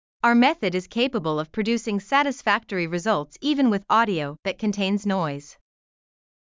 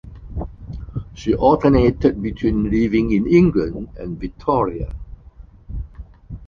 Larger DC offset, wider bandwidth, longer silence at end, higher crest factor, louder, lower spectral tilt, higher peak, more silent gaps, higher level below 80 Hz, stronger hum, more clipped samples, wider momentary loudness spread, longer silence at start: neither; about the same, 7.6 kHz vs 7 kHz; first, 0.9 s vs 0 s; about the same, 18 dB vs 18 dB; second, -23 LUFS vs -18 LUFS; second, -5.5 dB/octave vs -9 dB/octave; second, -6 dBFS vs -2 dBFS; neither; second, -60 dBFS vs -32 dBFS; neither; neither; second, 7 LU vs 19 LU; first, 0.25 s vs 0.05 s